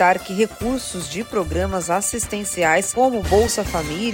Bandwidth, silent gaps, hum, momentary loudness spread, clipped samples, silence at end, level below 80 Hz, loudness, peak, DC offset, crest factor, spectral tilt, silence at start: 16.5 kHz; none; none; 7 LU; under 0.1%; 0 s; -36 dBFS; -20 LUFS; -4 dBFS; under 0.1%; 16 dB; -3.5 dB/octave; 0 s